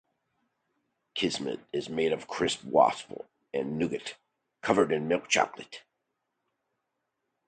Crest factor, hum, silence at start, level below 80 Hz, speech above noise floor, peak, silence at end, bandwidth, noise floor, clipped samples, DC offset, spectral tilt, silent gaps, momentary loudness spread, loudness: 24 dB; none; 1.15 s; -66 dBFS; 54 dB; -8 dBFS; 1.7 s; 9.4 kHz; -82 dBFS; under 0.1%; under 0.1%; -4 dB/octave; none; 18 LU; -29 LUFS